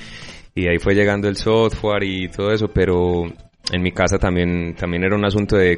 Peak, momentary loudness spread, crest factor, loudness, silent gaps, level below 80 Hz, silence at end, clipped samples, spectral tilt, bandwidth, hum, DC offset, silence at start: -4 dBFS; 8 LU; 14 dB; -19 LUFS; none; -34 dBFS; 0 s; under 0.1%; -6 dB/octave; 10.5 kHz; none; under 0.1%; 0 s